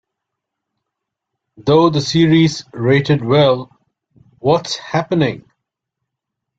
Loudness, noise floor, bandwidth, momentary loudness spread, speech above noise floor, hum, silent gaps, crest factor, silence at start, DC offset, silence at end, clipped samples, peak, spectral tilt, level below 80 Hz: -15 LUFS; -79 dBFS; 7.8 kHz; 9 LU; 65 dB; none; none; 16 dB; 1.6 s; under 0.1%; 1.2 s; under 0.1%; -2 dBFS; -6 dB/octave; -52 dBFS